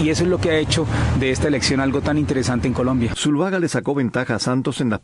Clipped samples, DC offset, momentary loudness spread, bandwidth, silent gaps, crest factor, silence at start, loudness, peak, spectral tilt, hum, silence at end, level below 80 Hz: under 0.1%; under 0.1%; 3 LU; 11.5 kHz; none; 14 dB; 0 s; -20 LUFS; -6 dBFS; -5.5 dB/octave; none; 0.05 s; -36 dBFS